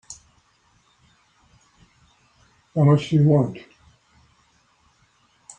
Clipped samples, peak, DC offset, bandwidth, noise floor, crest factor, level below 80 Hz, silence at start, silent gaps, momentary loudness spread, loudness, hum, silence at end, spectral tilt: under 0.1%; -4 dBFS; under 0.1%; 9 kHz; -62 dBFS; 20 dB; -60 dBFS; 0.1 s; none; 25 LU; -19 LUFS; none; 2 s; -8 dB/octave